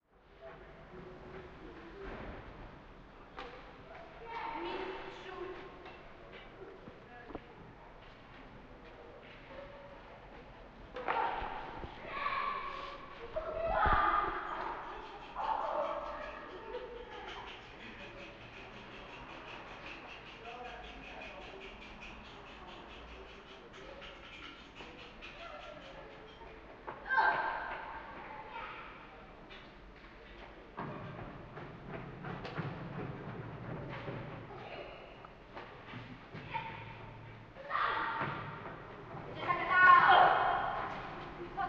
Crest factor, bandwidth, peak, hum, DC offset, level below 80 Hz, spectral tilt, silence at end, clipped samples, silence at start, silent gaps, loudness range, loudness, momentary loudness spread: 26 dB; 7.4 kHz; -12 dBFS; none; under 0.1%; -56 dBFS; -6 dB/octave; 0 s; under 0.1%; 0.25 s; none; 15 LU; -36 LUFS; 19 LU